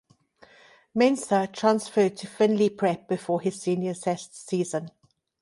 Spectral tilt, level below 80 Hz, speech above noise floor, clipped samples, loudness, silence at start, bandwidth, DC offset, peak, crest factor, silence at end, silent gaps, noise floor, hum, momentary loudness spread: -5.5 dB/octave; -72 dBFS; 32 dB; under 0.1%; -26 LUFS; 0.95 s; 11.5 kHz; under 0.1%; -8 dBFS; 18 dB; 0.55 s; none; -57 dBFS; none; 9 LU